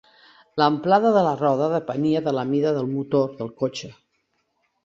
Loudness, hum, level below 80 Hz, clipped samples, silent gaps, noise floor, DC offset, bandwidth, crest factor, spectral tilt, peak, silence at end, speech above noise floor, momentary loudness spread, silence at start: -22 LUFS; none; -66 dBFS; under 0.1%; none; -71 dBFS; under 0.1%; 7.6 kHz; 20 dB; -7 dB/octave; -4 dBFS; 0.9 s; 50 dB; 10 LU; 0.55 s